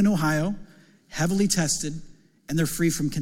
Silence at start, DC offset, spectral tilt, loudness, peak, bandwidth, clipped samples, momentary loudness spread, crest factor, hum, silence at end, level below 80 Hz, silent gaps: 0 s; under 0.1%; -4.5 dB/octave; -25 LUFS; -8 dBFS; 17 kHz; under 0.1%; 14 LU; 16 dB; none; 0 s; -46 dBFS; none